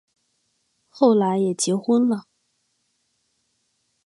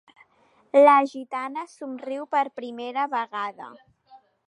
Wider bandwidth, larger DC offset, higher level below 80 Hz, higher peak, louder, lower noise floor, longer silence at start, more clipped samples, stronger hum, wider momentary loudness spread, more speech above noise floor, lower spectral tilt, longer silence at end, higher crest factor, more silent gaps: about the same, 11.5 kHz vs 10.5 kHz; neither; first, -74 dBFS vs -82 dBFS; about the same, -4 dBFS vs -4 dBFS; first, -20 LUFS vs -23 LUFS; first, -71 dBFS vs -62 dBFS; first, 0.95 s vs 0.75 s; neither; neither; second, 6 LU vs 19 LU; first, 52 dB vs 38 dB; first, -5.5 dB/octave vs -4 dB/octave; first, 1.85 s vs 0.3 s; about the same, 20 dB vs 20 dB; neither